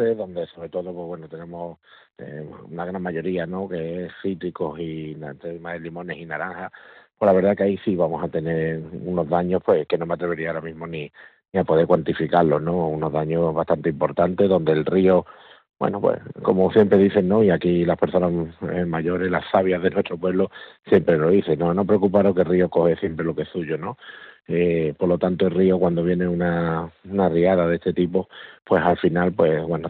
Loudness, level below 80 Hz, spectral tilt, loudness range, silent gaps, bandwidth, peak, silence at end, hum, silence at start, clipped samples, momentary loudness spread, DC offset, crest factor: -21 LUFS; -52 dBFS; -10.5 dB/octave; 10 LU; none; 4.5 kHz; -4 dBFS; 0 s; none; 0 s; under 0.1%; 15 LU; under 0.1%; 18 dB